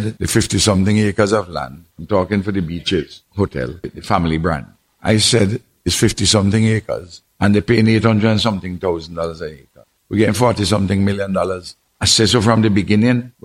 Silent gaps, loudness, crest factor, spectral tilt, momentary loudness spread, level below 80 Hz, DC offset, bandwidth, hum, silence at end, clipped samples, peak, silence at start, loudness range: none; -16 LUFS; 16 dB; -5 dB/octave; 13 LU; -40 dBFS; under 0.1%; 15.5 kHz; none; 0.15 s; under 0.1%; 0 dBFS; 0 s; 4 LU